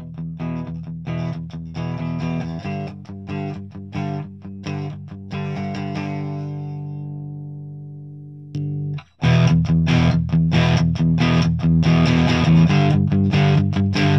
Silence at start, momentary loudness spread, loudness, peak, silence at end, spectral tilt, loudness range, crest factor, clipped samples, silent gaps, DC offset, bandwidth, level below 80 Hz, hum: 0 s; 17 LU; -20 LUFS; -4 dBFS; 0 s; -7.5 dB/octave; 13 LU; 16 dB; under 0.1%; none; 0.1%; 6.4 kHz; -38 dBFS; none